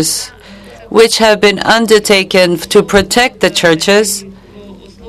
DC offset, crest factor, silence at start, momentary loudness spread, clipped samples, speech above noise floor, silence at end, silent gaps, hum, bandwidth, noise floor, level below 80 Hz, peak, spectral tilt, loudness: under 0.1%; 10 dB; 0 s; 7 LU; 0.8%; 24 dB; 0 s; none; none; 14.5 kHz; -34 dBFS; -38 dBFS; 0 dBFS; -3 dB/octave; -9 LUFS